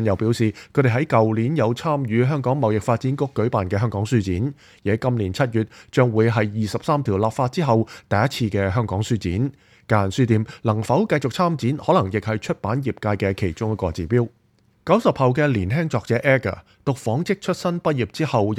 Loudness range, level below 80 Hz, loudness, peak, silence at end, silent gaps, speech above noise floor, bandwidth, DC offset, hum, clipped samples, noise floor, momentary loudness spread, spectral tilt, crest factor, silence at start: 2 LU; -50 dBFS; -21 LUFS; -2 dBFS; 0 s; none; 27 dB; 13 kHz; under 0.1%; none; under 0.1%; -48 dBFS; 6 LU; -7 dB/octave; 18 dB; 0 s